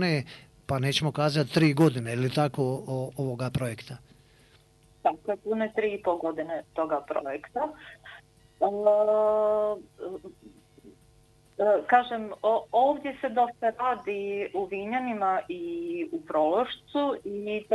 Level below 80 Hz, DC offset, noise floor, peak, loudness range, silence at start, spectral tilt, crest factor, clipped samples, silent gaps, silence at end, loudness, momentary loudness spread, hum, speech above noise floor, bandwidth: -62 dBFS; under 0.1%; -60 dBFS; -8 dBFS; 5 LU; 0 s; -6.5 dB/octave; 20 dB; under 0.1%; none; 0 s; -28 LUFS; 12 LU; none; 32 dB; 12 kHz